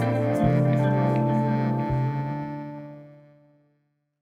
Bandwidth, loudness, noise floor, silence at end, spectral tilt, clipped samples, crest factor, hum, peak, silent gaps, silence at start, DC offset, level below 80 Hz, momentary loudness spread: 5.4 kHz; -24 LUFS; -71 dBFS; 1.1 s; -9.5 dB/octave; under 0.1%; 16 dB; none; -8 dBFS; none; 0 s; under 0.1%; -50 dBFS; 15 LU